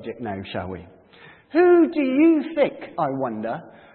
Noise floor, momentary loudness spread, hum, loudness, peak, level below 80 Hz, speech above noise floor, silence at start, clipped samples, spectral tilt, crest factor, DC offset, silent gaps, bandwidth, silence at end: -49 dBFS; 15 LU; none; -21 LUFS; -6 dBFS; -64 dBFS; 28 dB; 0 s; under 0.1%; -11 dB/octave; 16 dB; under 0.1%; none; 4.4 kHz; 0.25 s